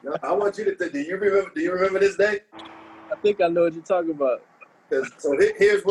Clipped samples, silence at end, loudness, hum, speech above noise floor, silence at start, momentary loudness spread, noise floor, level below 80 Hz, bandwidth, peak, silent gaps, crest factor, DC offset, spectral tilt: under 0.1%; 0 s; -23 LUFS; none; 21 dB; 0.05 s; 11 LU; -43 dBFS; -62 dBFS; 11 kHz; -6 dBFS; none; 16 dB; under 0.1%; -5 dB/octave